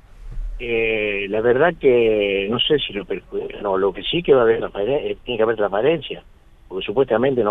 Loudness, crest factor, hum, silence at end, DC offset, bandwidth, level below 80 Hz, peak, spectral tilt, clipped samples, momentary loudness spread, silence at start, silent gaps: -19 LUFS; 16 dB; none; 0 s; under 0.1%; 4 kHz; -38 dBFS; -4 dBFS; -7.5 dB/octave; under 0.1%; 14 LU; 0.15 s; none